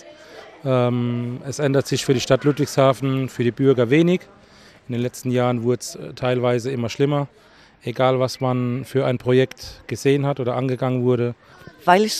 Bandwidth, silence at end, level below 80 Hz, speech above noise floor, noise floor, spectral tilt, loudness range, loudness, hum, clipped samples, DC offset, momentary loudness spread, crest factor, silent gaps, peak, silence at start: 14.5 kHz; 0 s; -56 dBFS; 29 dB; -49 dBFS; -6 dB/octave; 4 LU; -21 LUFS; none; under 0.1%; under 0.1%; 9 LU; 20 dB; none; -2 dBFS; 0.05 s